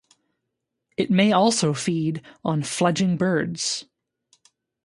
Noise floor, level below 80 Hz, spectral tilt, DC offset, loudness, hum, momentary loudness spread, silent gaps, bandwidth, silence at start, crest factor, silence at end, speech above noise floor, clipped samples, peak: -80 dBFS; -64 dBFS; -5 dB/octave; under 0.1%; -22 LUFS; none; 10 LU; none; 11.5 kHz; 1 s; 18 dB; 1.05 s; 59 dB; under 0.1%; -6 dBFS